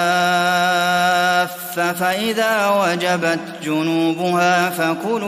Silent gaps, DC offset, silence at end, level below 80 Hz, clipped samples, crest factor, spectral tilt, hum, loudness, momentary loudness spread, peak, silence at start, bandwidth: none; under 0.1%; 0 s; -62 dBFS; under 0.1%; 14 dB; -4 dB/octave; none; -17 LUFS; 5 LU; -4 dBFS; 0 s; 16 kHz